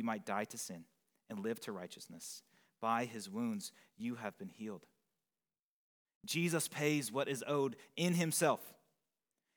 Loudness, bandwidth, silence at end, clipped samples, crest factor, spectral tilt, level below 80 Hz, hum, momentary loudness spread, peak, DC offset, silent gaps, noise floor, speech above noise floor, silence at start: -39 LUFS; over 20 kHz; 0.85 s; under 0.1%; 22 dB; -4.5 dB/octave; under -90 dBFS; none; 15 LU; -18 dBFS; under 0.1%; 5.59-6.06 s, 6.15-6.21 s; under -90 dBFS; over 51 dB; 0 s